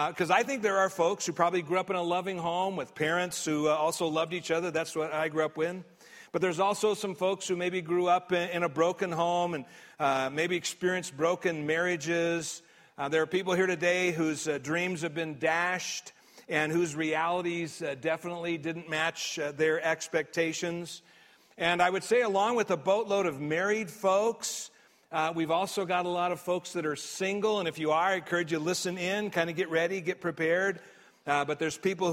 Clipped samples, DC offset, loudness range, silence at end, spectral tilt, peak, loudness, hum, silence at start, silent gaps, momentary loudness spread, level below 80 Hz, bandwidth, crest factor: under 0.1%; under 0.1%; 2 LU; 0 s; -4 dB/octave; -10 dBFS; -30 LUFS; none; 0 s; none; 7 LU; -74 dBFS; 16 kHz; 20 dB